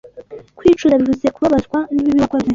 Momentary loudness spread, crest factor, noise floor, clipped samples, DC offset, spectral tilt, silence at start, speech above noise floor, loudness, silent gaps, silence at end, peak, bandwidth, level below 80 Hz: 4 LU; 14 dB; -36 dBFS; under 0.1%; under 0.1%; -7 dB/octave; 0.05 s; 21 dB; -15 LUFS; none; 0 s; -2 dBFS; 7.6 kHz; -42 dBFS